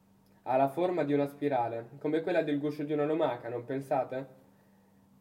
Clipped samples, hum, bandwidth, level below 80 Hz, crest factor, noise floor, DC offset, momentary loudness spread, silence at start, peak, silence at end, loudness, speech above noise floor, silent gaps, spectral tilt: under 0.1%; none; 16 kHz; -82 dBFS; 16 dB; -63 dBFS; under 0.1%; 9 LU; 0.45 s; -16 dBFS; 0.9 s; -32 LUFS; 32 dB; none; -8 dB/octave